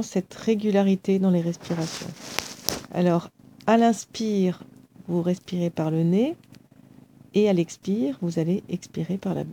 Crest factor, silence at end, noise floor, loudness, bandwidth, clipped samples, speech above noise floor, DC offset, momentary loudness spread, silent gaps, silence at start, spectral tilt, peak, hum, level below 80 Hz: 24 dB; 0 s; -51 dBFS; -25 LUFS; 18 kHz; under 0.1%; 28 dB; under 0.1%; 10 LU; none; 0 s; -6.5 dB/octave; 0 dBFS; none; -64 dBFS